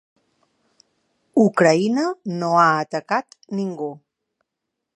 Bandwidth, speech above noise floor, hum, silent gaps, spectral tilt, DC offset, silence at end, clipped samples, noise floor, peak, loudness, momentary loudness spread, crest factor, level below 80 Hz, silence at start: 11 kHz; 62 dB; none; none; -6 dB/octave; under 0.1%; 1 s; under 0.1%; -81 dBFS; -2 dBFS; -20 LUFS; 12 LU; 20 dB; -76 dBFS; 1.35 s